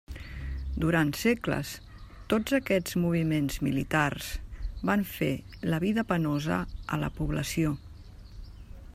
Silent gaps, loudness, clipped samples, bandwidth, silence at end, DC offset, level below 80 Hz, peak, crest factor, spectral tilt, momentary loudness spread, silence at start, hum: none; -29 LUFS; under 0.1%; 16 kHz; 0 s; under 0.1%; -42 dBFS; -10 dBFS; 20 dB; -6 dB/octave; 22 LU; 0.1 s; none